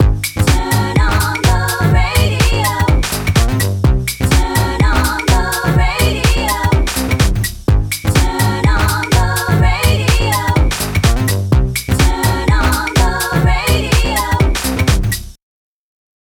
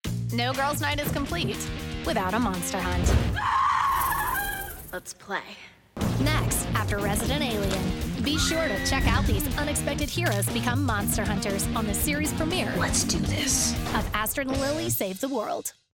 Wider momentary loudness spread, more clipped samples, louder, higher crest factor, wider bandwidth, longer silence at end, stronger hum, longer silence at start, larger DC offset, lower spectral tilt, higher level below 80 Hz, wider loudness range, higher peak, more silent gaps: second, 2 LU vs 8 LU; neither; first, -14 LUFS vs -26 LUFS; about the same, 12 dB vs 16 dB; first, 20 kHz vs 17.5 kHz; first, 0.95 s vs 0.25 s; neither; about the same, 0 s vs 0.05 s; neither; about the same, -4.5 dB/octave vs -4 dB/octave; first, -18 dBFS vs -36 dBFS; about the same, 1 LU vs 2 LU; first, 0 dBFS vs -10 dBFS; neither